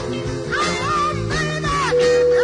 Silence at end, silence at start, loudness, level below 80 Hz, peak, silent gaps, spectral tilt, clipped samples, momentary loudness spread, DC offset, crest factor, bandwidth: 0 s; 0 s; -19 LUFS; -38 dBFS; -6 dBFS; none; -4.5 dB/octave; under 0.1%; 8 LU; under 0.1%; 12 dB; 11 kHz